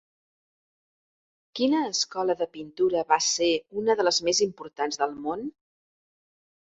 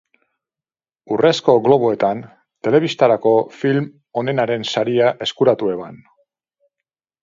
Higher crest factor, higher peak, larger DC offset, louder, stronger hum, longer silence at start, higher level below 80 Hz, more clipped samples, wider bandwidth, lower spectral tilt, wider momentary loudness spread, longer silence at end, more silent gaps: about the same, 22 dB vs 18 dB; second, -6 dBFS vs 0 dBFS; neither; second, -26 LUFS vs -17 LUFS; neither; first, 1.55 s vs 1.1 s; about the same, -68 dBFS vs -64 dBFS; neither; first, 8.4 kHz vs 7.6 kHz; second, -2 dB/octave vs -6 dB/octave; about the same, 10 LU vs 11 LU; about the same, 1.25 s vs 1.25 s; neither